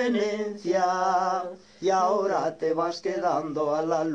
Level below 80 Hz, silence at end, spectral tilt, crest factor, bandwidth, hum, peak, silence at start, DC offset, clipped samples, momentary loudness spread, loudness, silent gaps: -70 dBFS; 0 s; -5 dB/octave; 14 dB; 9.2 kHz; none; -12 dBFS; 0 s; under 0.1%; under 0.1%; 6 LU; -26 LUFS; none